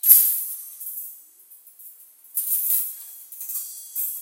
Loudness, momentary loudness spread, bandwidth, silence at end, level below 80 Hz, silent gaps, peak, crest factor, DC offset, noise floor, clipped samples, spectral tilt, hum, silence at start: -21 LUFS; 24 LU; 17 kHz; 0 s; under -90 dBFS; none; 0 dBFS; 24 dB; under 0.1%; -50 dBFS; under 0.1%; 6 dB/octave; none; 0.05 s